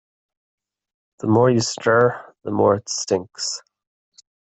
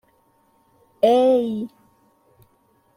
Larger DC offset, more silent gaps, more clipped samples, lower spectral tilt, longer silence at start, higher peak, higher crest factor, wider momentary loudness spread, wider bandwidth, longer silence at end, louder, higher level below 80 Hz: neither; neither; neither; second, -4.5 dB/octave vs -6.5 dB/octave; first, 1.25 s vs 1.05 s; about the same, -4 dBFS vs -4 dBFS; about the same, 18 dB vs 18 dB; second, 11 LU vs 15 LU; second, 8.4 kHz vs 15.5 kHz; second, 0.85 s vs 1.3 s; about the same, -20 LUFS vs -19 LUFS; first, -60 dBFS vs -70 dBFS